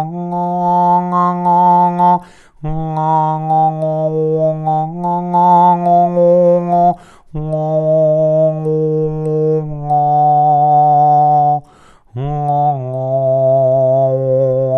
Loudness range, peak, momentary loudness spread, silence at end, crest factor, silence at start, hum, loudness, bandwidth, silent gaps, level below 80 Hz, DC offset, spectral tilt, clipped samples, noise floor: 3 LU; 0 dBFS; 9 LU; 0 s; 12 dB; 0 s; none; -13 LUFS; 6.2 kHz; none; -42 dBFS; under 0.1%; -10.5 dB/octave; under 0.1%; -45 dBFS